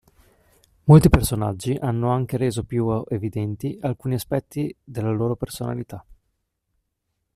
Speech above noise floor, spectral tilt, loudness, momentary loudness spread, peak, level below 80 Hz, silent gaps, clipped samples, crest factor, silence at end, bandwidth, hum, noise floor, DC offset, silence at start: 56 dB; -7.5 dB/octave; -22 LUFS; 15 LU; -2 dBFS; -38 dBFS; none; under 0.1%; 20 dB; 1.25 s; 14 kHz; none; -77 dBFS; under 0.1%; 0.85 s